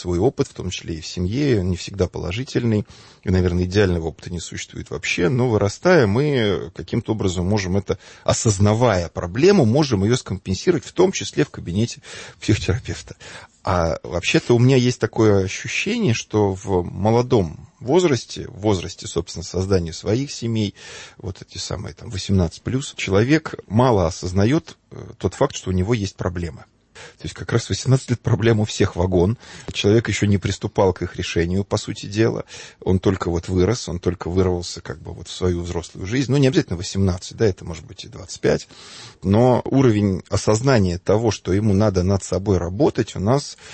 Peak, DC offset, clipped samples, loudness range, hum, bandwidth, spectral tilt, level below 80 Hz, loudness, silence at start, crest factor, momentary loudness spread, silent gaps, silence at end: -4 dBFS; under 0.1%; under 0.1%; 5 LU; none; 8.8 kHz; -6 dB/octave; -42 dBFS; -20 LUFS; 0 s; 16 dB; 13 LU; none; 0 s